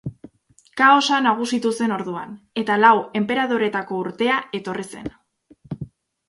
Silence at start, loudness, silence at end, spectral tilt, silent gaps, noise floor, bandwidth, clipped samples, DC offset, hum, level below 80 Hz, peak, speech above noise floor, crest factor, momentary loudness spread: 0.05 s; -20 LUFS; 0.45 s; -4.5 dB/octave; none; -56 dBFS; 11.5 kHz; under 0.1%; under 0.1%; none; -58 dBFS; 0 dBFS; 36 dB; 20 dB; 20 LU